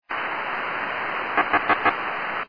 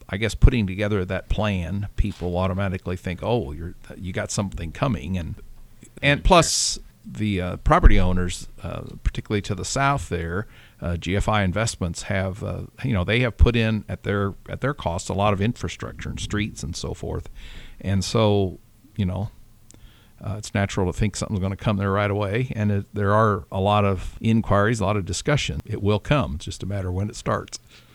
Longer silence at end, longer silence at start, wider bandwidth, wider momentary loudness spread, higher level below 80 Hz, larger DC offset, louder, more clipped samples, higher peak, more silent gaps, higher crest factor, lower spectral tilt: second, 0 s vs 0.4 s; about the same, 0.1 s vs 0 s; second, 5.2 kHz vs 13.5 kHz; second, 6 LU vs 13 LU; second, -62 dBFS vs -30 dBFS; first, 0.3% vs under 0.1%; about the same, -24 LUFS vs -24 LUFS; neither; second, -6 dBFS vs 0 dBFS; neither; about the same, 20 dB vs 22 dB; about the same, -6 dB/octave vs -5.5 dB/octave